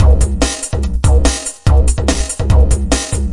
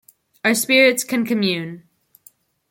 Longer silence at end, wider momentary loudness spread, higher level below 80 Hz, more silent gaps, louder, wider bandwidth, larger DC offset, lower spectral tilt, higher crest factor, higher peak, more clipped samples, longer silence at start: second, 0 s vs 0.9 s; second, 5 LU vs 11 LU; first, -14 dBFS vs -70 dBFS; neither; first, -14 LUFS vs -17 LUFS; second, 11.5 kHz vs 17 kHz; neither; first, -5 dB/octave vs -3 dB/octave; second, 12 dB vs 18 dB; about the same, 0 dBFS vs -2 dBFS; neither; second, 0 s vs 0.45 s